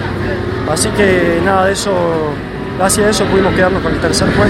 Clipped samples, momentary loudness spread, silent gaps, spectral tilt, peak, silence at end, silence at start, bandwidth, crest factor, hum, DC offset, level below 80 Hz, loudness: under 0.1%; 7 LU; none; -4.5 dB/octave; 0 dBFS; 0 s; 0 s; 16.5 kHz; 12 dB; none; under 0.1%; -30 dBFS; -13 LUFS